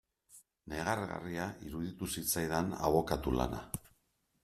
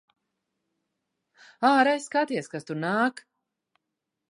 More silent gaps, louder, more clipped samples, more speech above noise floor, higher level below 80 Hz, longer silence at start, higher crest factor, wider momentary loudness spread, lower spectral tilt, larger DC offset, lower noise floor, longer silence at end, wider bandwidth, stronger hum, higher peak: neither; second, -36 LUFS vs -25 LUFS; neither; second, 42 dB vs 60 dB; first, -52 dBFS vs -84 dBFS; second, 0.3 s vs 1.6 s; about the same, 22 dB vs 22 dB; about the same, 12 LU vs 11 LU; about the same, -4.5 dB/octave vs -5 dB/octave; neither; second, -77 dBFS vs -84 dBFS; second, 0.55 s vs 1.1 s; first, 15.5 kHz vs 11 kHz; neither; second, -14 dBFS vs -8 dBFS